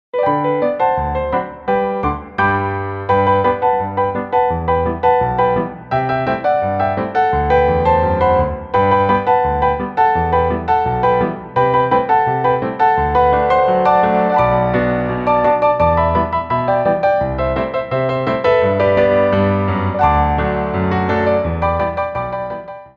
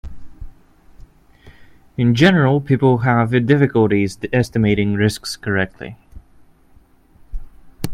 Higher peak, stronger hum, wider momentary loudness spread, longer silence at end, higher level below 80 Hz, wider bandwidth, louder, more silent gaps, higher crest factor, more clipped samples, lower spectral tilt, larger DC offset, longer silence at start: about the same, -2 dBFS vs 0 dBFS; neither; second, 6 LU vs 22 LU; about the same, 0.1 s vs 0 s; first, -32 dBFS vs -40 dBFS; second, 6.4 kHz vs 15.5 kHz; about the same, -16 LUFS vs -16 LUFS; neither; about the same, 14 dB vs 18 dB; neither; first, -9 dB/octave vs -7 dB/octave; neither; about the same, 0.15 s vs 0.05 s